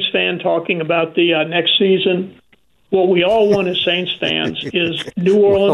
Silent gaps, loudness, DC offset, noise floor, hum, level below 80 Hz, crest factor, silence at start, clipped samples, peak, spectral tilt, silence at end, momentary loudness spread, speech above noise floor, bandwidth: none; -15 LUFS; under 0.1%; -57 dBFS; none; -54 dBFS; 12 dB; 0 s; under 0.1%; -4 dBFS; -6 dB/octave; 0 s; 6 LU; 42 dB; 9.6 kHz